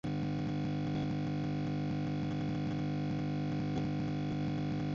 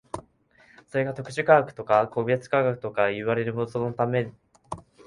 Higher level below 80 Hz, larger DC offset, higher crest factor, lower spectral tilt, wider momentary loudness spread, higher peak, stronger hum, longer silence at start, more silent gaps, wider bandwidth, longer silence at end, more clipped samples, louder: first, -54 dBFS vs -60 dBFS; neither; second, 10 dB vs 22 dB; about the same, -7.5 dB/octave vs -7 dB/octave; second, 1 LU vs 19 LU; second, -24 dBFS vs -4 dBFS; neither; about the same, 0.05 s vs 0.15 s; neither; second, 7.2 kHz vs 11.5 kHz; second, 0 s vs 0.25 s; neither; second, -36 LUFS vs -25 LUFS